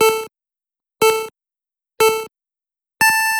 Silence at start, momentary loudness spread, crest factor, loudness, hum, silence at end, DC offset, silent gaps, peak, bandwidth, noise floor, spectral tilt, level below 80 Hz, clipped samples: 0 s; 19 LU; 20 dB; -17 LUFS; none; 0 s; under 0.1%; none; 0 dBFS; 18.5 kHz; -87 dBFS; -1 dB/octave; -62 dBFS; under 0.1%